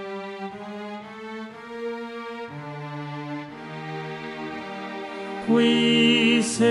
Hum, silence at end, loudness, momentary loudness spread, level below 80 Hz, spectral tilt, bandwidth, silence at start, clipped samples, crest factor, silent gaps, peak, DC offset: none; 0 s; -25 LUFS; 18 LU; -68 dBFS; -4 dB/octave; 11.5 kHz; 0 s; under 0.1%; 18 dB; none; -8 dBFS; under 0.1%